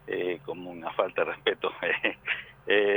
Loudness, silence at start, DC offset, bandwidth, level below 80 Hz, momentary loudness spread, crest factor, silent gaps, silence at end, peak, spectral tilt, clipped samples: -29 LUFS; 0.05 s; under 0.1%; 19.5 kHz; -66 dBFS; 9 LU; 20 dB; none; 0 s; -10 dBFS; -6.5 dB/octave; under 0.1%